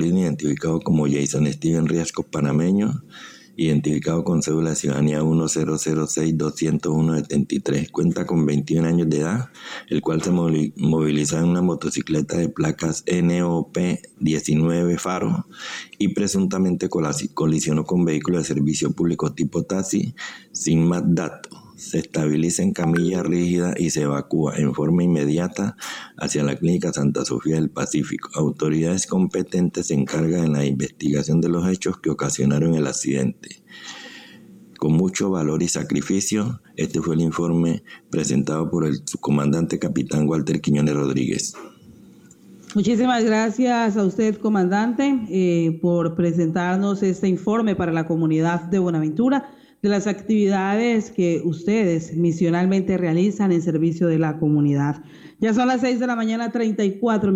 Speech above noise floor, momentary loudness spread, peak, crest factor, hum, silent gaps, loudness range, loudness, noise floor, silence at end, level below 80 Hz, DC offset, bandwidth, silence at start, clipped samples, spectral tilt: 27 dB; 6 LU; -10 dBFS; 10 dB; none; none; 2 LU; -21 LUFS; -47 dBFS; 0 s; -52 dBFS; under 0.1%; 15.5 kHz; 0 s; under 0.1%; -6 dB/octave